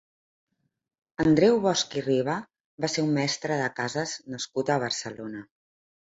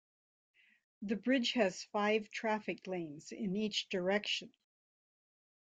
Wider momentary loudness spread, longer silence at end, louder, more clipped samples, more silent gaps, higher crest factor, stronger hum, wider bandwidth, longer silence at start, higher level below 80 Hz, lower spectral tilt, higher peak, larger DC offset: first, 15 LU vs 10 LU; second, 0.7 s vs 1.3 s; first, -26 LUFS vs -36 LUFS; neither; first, 2.64-2.78 s vs none; about the same, 20 dB vs 20 dB; neither; second, 8 kHz vs 9.2 kHz; first, 1.2 s vs 1 s; first, -62 dBFS vs -80 dBFS; about the same, -4.5 dB/octave vs -4 dB/octave; first, -8 dBFS vs -18 dBFS; neither